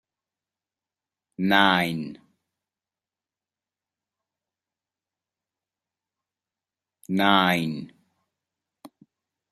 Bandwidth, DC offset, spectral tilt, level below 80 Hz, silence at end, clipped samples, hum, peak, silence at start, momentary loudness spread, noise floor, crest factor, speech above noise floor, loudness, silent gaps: 14.5 kHz; under 0.1%; -5.5 dB/octave; -70 dBFS; 0.65 s; under 0.1%; none; -2 dBFS; 1.4 s; 15 LU; under -90 dBFS; 28 dB; over 68 dB; -22 LUFS; none